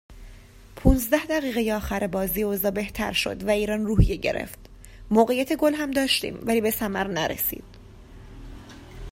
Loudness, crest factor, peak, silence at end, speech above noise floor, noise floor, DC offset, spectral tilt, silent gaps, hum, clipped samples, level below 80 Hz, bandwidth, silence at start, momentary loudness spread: -24 LUFS; 22 dB; -4 dBFS; 0 s; 23 dB; -46 dBFS; under 0.1%; -5 dB/octave; none; none; under 0.1%; -34 dBFS; 16.5 kHz; 0.1 s; 19 LU